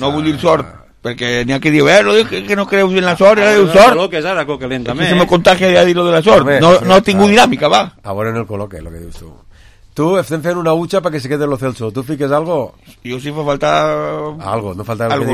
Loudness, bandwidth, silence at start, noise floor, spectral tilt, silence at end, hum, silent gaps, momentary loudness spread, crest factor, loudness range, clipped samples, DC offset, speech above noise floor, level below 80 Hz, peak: -12 LUFS; 15 kHz; 0 s; -40 dBFS; -5 dB/octave; 0 s; none; none; 15 LU; 12 dB; 8 LU; 0.3%; under 0.1%; 28 dB; -40 dBFS; 0 dBFS